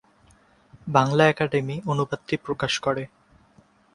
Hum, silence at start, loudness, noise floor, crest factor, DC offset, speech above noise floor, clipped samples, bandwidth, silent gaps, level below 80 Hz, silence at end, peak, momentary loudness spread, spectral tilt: none; 0.75 s; -24 LUFS; -58 dBFS; 24 dB; under 0.1%; 35 dB; under 0.1%; 11 kHz; none; -56 dBFS; 0.9 s; -2 dBFS; 11 LU; -5.5 dB/octave